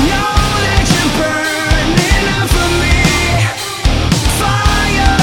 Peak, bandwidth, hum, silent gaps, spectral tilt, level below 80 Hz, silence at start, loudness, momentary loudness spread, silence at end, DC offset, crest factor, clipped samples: 0 dBFS; 18 kHz; none; none; -4 dB/octave; -18 dBFS; 0 s; -12 LUFS; 3 LU; 0 s; under 0.1%; 12 dB; under 0.1%